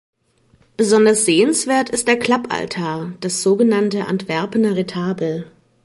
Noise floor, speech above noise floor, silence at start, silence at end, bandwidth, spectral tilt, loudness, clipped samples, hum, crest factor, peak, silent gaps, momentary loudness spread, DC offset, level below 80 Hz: -57 dBFS; 40 dB; 0.8 s; 0.35 s; 11.5 kHz; -4 dB/octave; -17 LUFS; under 0.1%; none; 16 dB; -2 dBFS; none; 10 LU; under 0.1%; -58 dBFS